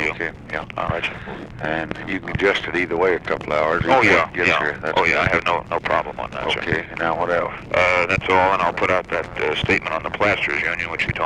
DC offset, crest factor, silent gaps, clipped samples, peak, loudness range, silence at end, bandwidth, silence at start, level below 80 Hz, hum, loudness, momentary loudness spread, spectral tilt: under 0.1%; 18 dB; none; under 0.1%; -2 dBFS; 4 LU; 0 s; 11.5 kHz; 0 s; -42 dBFS; none; -20 LUFS; 10 LU; -5 dB/octave